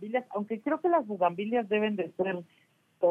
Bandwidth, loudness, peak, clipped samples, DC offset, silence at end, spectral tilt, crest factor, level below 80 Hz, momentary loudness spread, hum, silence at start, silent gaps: 3.8 kHz; -30 LUFS; -14 dBFS; under 0.1%; under 0.1%; 0 s; -8 dB/octave; 16 dB; -80 dBFS; 6 LU; none; 0 s; none